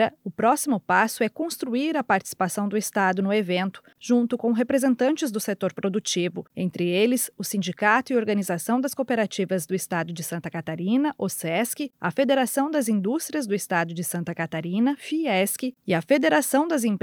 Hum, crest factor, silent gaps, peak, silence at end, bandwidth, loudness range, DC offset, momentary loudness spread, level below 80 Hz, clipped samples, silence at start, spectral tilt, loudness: none; 18 dB; none; -6 dBFS; 0.05 s; 18.5 kHz; 2 LU; under 0.1%; 8 LU; -74 dBFS; under 0.1%; 0 s; -4.5 dB/octave; -24 LUFS